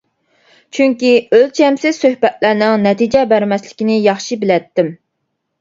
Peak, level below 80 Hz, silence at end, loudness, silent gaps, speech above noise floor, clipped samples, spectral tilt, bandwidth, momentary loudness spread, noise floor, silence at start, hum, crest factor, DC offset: 0 dBFS; -54 dBFS; 0.65 s; -13 LUFS; none; 58 dB; under 0.1%; -5.5 dB/octave; 7.8 kHz; 8 LU; -71 dBFS; 0.75 s; none; 14 dB; under 0.1%